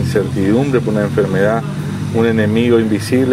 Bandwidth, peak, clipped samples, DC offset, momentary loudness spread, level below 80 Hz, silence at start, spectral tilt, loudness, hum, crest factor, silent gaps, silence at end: 15.5 kHz; 0 dBFS; under 0.1%; under 0.1%; 6 LU; -44 dBFS; 0 s; -7 dB/octave; -15 LUFS; none; 14 dB; none; 0 s